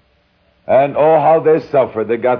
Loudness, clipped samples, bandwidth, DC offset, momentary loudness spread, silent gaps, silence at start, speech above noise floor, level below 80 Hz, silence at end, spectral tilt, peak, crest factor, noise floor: -13 LUFS; under 0.1%; 5.4 kHz; under 0.1%; 6 LU; none; 0.7 s; 44 dB; -56 dBFS; 0 s; -9.5 dB/octave; -2 dBFS; 12 dB; -57 dBFS